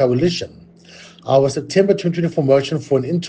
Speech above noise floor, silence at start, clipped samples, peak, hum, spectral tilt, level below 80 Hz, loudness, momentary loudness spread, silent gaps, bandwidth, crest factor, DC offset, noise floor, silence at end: 26 dB; 0 s; under 0.1%; -2 dBFS; none; -6.5 dB/octave; -56 dBFS; -17 LUFS; 8 LU; none; 9.4 kHz; 16 dB; under 0.1%; -43 dBFS; 0 s